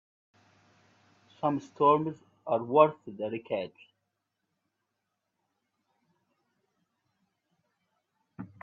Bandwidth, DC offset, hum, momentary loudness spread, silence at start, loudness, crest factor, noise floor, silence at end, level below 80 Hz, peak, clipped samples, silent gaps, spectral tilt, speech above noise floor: 7.2 kHz; under 0.1%; none; 20 LU; 1.4 s; -28 LUFS; 26 dB; -83 dBFS; 0.15 s; -78 dBFS; -6 dBFS; under 0.1%; none; -8 dB/octave; 56 dB